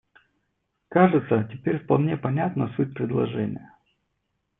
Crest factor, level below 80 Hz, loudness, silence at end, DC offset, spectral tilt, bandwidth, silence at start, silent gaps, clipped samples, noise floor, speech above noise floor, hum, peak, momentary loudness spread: 22 dB; -64 dBFS; -24 LUFS; 0.95 s; under 0.1%; -12 dB/octave; 3.9 kHz; 0.9 s; none; under 0.1%; -76 dBFS; 53 dB; none; -4 dBFS; 9 LU